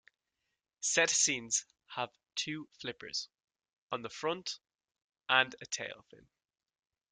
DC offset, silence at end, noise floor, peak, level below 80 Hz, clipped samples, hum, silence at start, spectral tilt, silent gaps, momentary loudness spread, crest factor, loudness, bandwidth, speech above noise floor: under 0.1%; 0.95 s; -87 dBFS; -10 dBFS; -78 dBFS; under 0.1%; none; 0.8 s; -0.5 dB/octave; 3.78-3.89 s, 4.75-4.79 s, 5.04-5.10 s; 16 LU; 28 dB; -33 LUFS; 11 kHz; 52 dB